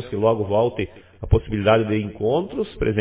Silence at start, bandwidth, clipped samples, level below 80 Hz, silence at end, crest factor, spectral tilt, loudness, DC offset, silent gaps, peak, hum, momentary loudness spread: 0 s; 4 kHz; under 0.1%; -34 dBFS; 0 s; 18 dB; -11.5 dB/octave; -21 LUFS; under 0.1%; none; -2 dBFS; none; 10 LU